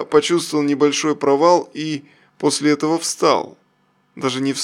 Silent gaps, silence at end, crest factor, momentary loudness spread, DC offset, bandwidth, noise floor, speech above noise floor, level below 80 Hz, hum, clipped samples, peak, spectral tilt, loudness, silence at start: none; 0 s; 18 dB; 11 LU; under 0.1%; 15 kHz; -61 dBFS; 44 dB; -66 dBFS; none; under 0.1%; -2 dBFS; -4 dB/octave; -18 LUFS; 0 s